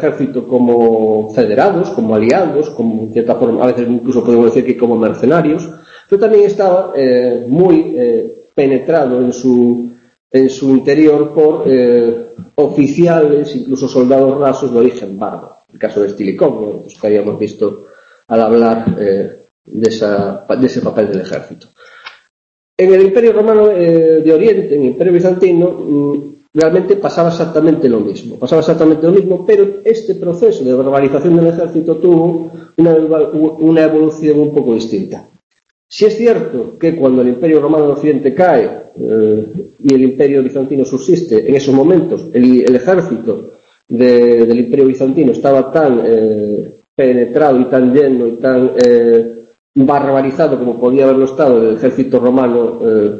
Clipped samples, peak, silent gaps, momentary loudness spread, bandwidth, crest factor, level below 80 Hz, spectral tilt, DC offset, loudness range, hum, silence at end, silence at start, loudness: under 0.1%; 0 dBFS; 10.20-10.30 s, 19.51-19.65 s, 22.30-22.77 s, 35.43-35.50 s, 35.71-35.89 s, 46.88-46.97 s, 49.59-49.74 s; 9 LU; 7.8 kHz; 10 dB; -52 dBFS; -8 dB/octave; under 0.1%; 4 LU; none; 0 s; 0 s; -11 LUFS